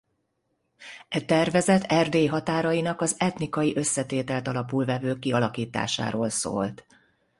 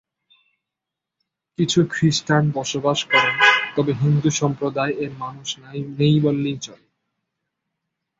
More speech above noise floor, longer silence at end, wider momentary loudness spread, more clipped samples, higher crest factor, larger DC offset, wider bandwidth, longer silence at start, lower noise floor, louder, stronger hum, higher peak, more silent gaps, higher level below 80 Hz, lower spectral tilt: second, 50 dB vs 65 dB; second, 0.65 s vs 1.45 s; second, 8 LU vs 15 LU; neither; about the same, 18 dB vs 20 dB; neither; first, 11.5 kHz vs 7.8 kHz; second, 0.8 s vs 1.6 s; second, -75 dBFS vs -85 dBFS; second, -25 LUFS vs -19 LUFS; neither; second, -8 dBFS vs -2 dBFS; neither; about the same, -60 dBFS vs -58 dBFS; about the same, -4.5 dB/octave vs -5 dB/octave